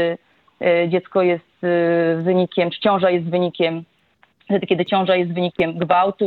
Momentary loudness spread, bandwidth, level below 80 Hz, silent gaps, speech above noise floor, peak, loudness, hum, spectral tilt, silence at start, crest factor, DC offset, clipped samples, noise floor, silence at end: 6 LU; 4.6 kHz; -62 dBFS; none; 41 dB; -4 dBFS; -19 LUFS; none; -9 dB/octave; 0 s; 16 dB; under 0.1%; under 0.1%; -59 dBFS; 0 s